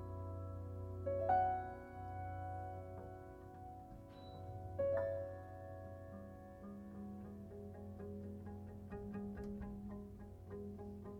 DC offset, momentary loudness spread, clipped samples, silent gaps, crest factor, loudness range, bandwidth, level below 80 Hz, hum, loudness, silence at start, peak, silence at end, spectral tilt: under 0.1%; 15 LU; under 0.1%; none; 22 dB; 9 LU; 15.5 kHz; -62 dBFS; none; -46 LUFS; 0 s; -24 dBFS; 0 s; -9 dB/octave